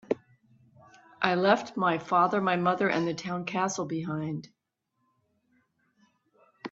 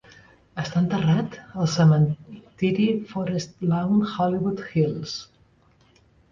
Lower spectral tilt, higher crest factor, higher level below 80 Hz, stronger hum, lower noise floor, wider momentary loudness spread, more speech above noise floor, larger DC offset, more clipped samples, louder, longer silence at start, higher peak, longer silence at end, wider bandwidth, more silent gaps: second, -5 dB/octave vs -7 dB/octave; first, 24 dB vs 16 dB; second, -72 dBFS vs -56 dBFS; neither; first, -79 dBFS vs -59 dBFS; second, 10 LU vs 14 LU; first, 52 dB vs 37 dB; neither; neither; second, -28 LUFS vs -23 LUFS; second, 0.1 s vs 0.55 s; about the same, -6 dBFS vs -8 dBFS; second, 0.05 s vs 1.1 s; about the same, 7.8 kHz vs 7.4 kHz; neither